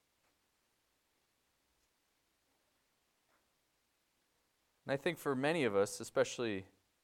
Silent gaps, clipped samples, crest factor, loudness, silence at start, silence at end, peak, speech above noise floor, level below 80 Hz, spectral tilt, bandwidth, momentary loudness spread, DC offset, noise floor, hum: none; under 0.1%; 22 dB; -37 LUFS; 4.85 s; 0.4 s; -20 dBFS; 44 dB; -82 dBFS; -4.5 dB/octave; 16.5 kHz; 8 LU; under 0.1%; -80 dBFS; none